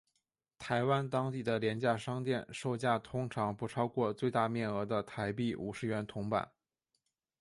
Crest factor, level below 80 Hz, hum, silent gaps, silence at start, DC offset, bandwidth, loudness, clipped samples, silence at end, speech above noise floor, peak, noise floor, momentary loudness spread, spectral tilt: 20 dB; -68 dBFS; none; none; 0.6 s; under 0.1%; 11.5 kHz; -35 LUFS; under 0.1%; 0.95 s; 50 dB; -16 dBFS; -85 dBFS; 5 LU; -6.5 dB/octave